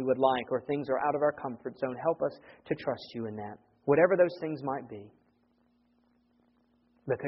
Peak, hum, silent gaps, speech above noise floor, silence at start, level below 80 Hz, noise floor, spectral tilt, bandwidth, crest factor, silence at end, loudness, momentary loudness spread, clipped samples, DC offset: -10 dBFS; none; none; 40 dB; 0 s; -70 dBFS; -70 dBFS; -5 dB/octave; 5.8 kHz; 22 dB; 0 s; -31 LUFS; 14 LU; under 0.1%; under 0.1%